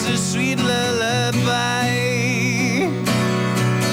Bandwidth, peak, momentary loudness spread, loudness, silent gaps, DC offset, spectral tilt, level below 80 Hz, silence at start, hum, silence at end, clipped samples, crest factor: 19.5 kHz; -8 dBFS; 1 LU; -19 LUFS; none; under 0.1%; -4.5 dB/octave; -52 dBFS; 0 s; none; 0 s; under 0.1%; 10 dB